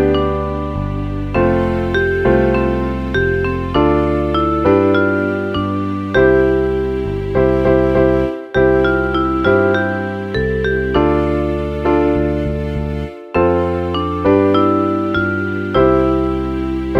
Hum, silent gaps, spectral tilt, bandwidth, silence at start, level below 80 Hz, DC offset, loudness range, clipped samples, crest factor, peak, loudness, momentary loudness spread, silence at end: none; none; -8.5 dB/octave; 6.6 kHz; 0 s; -28 dBFS; under 0.1%; 2 LU; under 0.1%; 14 dB; 0 dBFS; -16 LUFS; 7 LU; 0 s